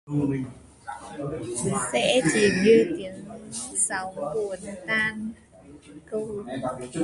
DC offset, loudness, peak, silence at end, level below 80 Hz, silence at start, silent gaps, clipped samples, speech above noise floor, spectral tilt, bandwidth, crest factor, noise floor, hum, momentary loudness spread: under 0.1%; -25 LUFS; -6 dBFS; 0 s; -56 dBFS; 0.05 s; none; under 0.1%; 23 dB; -4 dB/octave; 11.5 kHz; 20 dB; -48 dBFS; none; 18 LU